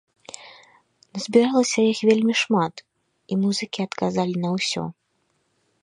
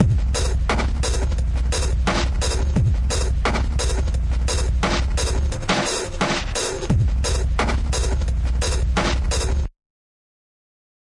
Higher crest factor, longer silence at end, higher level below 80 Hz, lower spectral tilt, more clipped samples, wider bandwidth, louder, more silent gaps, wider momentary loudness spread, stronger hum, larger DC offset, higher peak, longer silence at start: about the same, 20 dB vs 18 dB; second, 0.9 s vs 1.35 s; second, -68 dBFS vs -22 dBFS; about the same, -4.5 dB/octave vs -4.5 dB/octave; neither; about the same, 11 kHz vs 11.5 kHz; about the same, -22 LUFS vs -22 LUFS; neither; first, 18 LU vs 3 LU; neither; neither; about the same, -4 dBFS vs -2 dBFS; first, 0.4 s vs 0 s